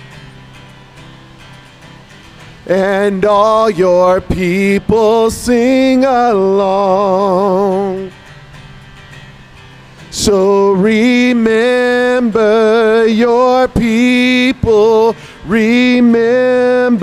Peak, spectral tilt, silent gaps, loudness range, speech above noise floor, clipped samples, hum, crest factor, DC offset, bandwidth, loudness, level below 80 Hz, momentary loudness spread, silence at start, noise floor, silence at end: 0 dBFS; -5.5 dB/octave; none; 6 LU; 27 dB; under 0.1%; none; 12 dB; under 0.1%; 15 kHz; -11 LUFS; -38 dBFS; 5 LU; 0 s; -37 dBFS; 0 s